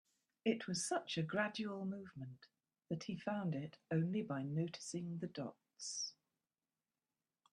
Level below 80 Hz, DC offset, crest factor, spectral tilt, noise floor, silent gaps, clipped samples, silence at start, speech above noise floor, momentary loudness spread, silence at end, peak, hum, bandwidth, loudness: -82 dBFS; under 0.1%; 20 dB; -5 dB/octave; under -90 dBFS; none; under 0.1%; 0.45 s; over 48 dB; 11 LU; 1.4 s; -24 dBFS; none; 11.5 kHz; -43 LUFS